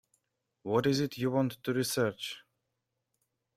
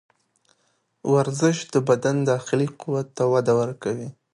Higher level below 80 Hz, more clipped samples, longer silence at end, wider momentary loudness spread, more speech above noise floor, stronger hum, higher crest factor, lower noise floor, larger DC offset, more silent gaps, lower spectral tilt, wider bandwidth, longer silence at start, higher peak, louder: about the same, -70 dBFS vs -66 dBFS; neither; first, 1.2 s vs 0.2 s; first, 12 LU vs 9 LU; first, 53 dB vs 47 dB; neither; about the same, 20 dB vs 18 dB; first, -84 dBFS vs -69 dBFS; neither; neither; about the same, -5 dB/octave vs -6 dB/octave; first, 16 kHz vs 11.5 kHz; second, 0.65 s vs 1.05 s; second, -14 dBFS vs -6 dBFS; second, -31 LUFS vs -23 LUFS